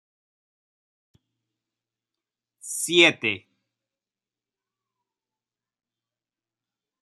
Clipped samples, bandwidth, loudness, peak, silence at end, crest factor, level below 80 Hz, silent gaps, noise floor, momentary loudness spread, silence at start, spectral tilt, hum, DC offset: under 0.1%; 13.5 kHz; -20 LUFS; -2 dBFS; 3.65 s; 28 dB; -80 dBFS; none; under -90 dBFS; 17 LU; 2.65 s; -2 dB/octave; none; under 0.1%